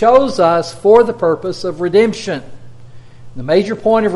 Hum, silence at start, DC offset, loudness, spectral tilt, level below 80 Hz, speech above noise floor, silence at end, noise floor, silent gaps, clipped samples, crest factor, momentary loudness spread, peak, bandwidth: none; 0 s; under 0.1%; -14 LUFS; -6 dB/octave; -46 dBFS; 21 dB; 0 s; -33 dBFS; none; under 0.1%; 14 dB; 12 LU; 0 dBFS; 11.5 kHz